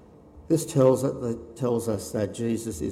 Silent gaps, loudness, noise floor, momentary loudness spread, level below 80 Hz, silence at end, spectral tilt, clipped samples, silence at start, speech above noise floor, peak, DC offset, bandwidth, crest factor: none; -26 LUFS; -49 dBFS; 9 LU; -54 dBFS; 0 s; -6.5 dB/octave; under 0.1%; 0.35 s; 24 dB; -8 dBFS; under 0.1%; 16 kHz; 18 dB